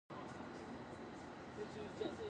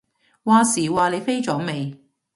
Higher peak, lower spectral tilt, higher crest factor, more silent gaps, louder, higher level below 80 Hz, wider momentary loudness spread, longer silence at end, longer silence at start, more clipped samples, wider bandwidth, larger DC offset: second, -32 dBFS vs -4 dBFS; about the same, -5.5 dB/octave vs -4.5 dB/octave; about the same, 18 dB vs 18 dB; neither; second, -50 LUFS vs -20 LUFS; second, -70 dBFS vs -62 dBFS; second, 6 LU vs 13 LU; second, 0 s vs 0.4 s; second, 0.1 s vs 0.45 s; neither; second, 10 kHz vs 11.5 kHz; neither